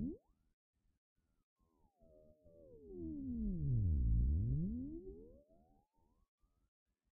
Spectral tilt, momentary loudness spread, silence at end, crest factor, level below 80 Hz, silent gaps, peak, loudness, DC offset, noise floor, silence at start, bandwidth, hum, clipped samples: -17 dB/octave; 20 LU; 1.85 s; 16 dB; -46 dBFS; 0.53-0.73 s, 0.98-1.16 s, 1.44-1.56 s; -26 dBFS; -40 LUFS; under 0.1%; -77 dBFS; 0 s; 1 kHz; none; under 0.1%